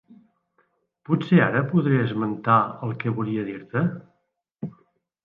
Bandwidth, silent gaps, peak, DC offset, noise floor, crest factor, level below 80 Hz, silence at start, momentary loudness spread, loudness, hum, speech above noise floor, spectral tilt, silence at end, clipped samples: 4.5 kHz; none; -6 dBFS; under 0.1%; -74 dBFS; 20 dB; -66 dBFS; 1.1 s; 19 LU; -23 LUFS; none; 52 dB; -10 dB/octave; 0.55 s; under 0.1%